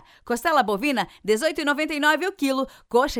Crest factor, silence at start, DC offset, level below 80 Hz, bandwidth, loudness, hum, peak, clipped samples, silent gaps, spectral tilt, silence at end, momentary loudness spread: 16 dB; 0.25 s; under 0.1%; -50 dBFS; 19 kHz; -23 LUFS; none; -6 dBFS; under 0.1%; none; -3.5 dB/octave; 0 s; 5 LU